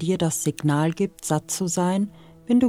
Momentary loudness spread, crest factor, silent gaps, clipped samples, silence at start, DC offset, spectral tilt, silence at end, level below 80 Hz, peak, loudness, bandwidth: 4 LU; 16 dB; none; under 0.1%; 0 s; under 0.1%; -5.5 dB/octave; 0 s; -58 dBFS; -8 dBFS; -24 LUFS; 16.5 kHz